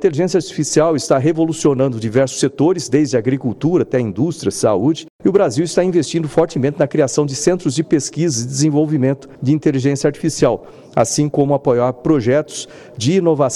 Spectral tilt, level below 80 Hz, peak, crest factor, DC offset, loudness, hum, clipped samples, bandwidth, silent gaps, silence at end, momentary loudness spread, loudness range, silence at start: -5.5 dB/octave; -50 dBFS; -2 dBFS; 14 dB; under 0.1%; -16 LUFS; none; under 0.1%; 12.5 kHz; 5.10-5.19 s; 0 s; 4 LU; 1 LU; 0 s